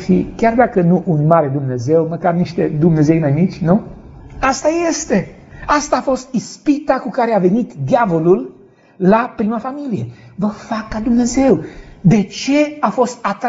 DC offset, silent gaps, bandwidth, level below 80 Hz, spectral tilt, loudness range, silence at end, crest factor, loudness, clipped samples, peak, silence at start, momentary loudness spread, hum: under 0.1%; none; 8 kHz; -40 dBFS; -7 dB/octave; 3 LU; 0 s; 16 dB; -16 LUFS; under 0.1%; 0 dBFS; 0 s; 9 LU; none